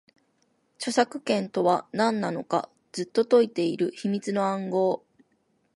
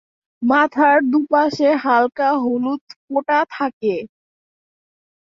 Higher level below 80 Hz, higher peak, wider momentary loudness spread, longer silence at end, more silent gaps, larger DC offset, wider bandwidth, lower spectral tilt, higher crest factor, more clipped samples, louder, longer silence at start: second, -78 dBFS vs -68 dBFS; second, -8 dBFS vs -2 dBFS; about the same, 8 LU vs 10 LU; second, 0.8 s vs 1.35 s; second, none vs 2.81-2.87 s, 2.96-3.08 s, 3.73-3.81 s; neither; first, 11.5 kHz vs 7.4 kHz; about the same, -5.5 dB/octave vs -5.5 dB/octave; about the same, 20 dB vs 16 dB; neither; second, -26 LUFS vs -17 LUFS; first, 0.8 s vs 0.4 s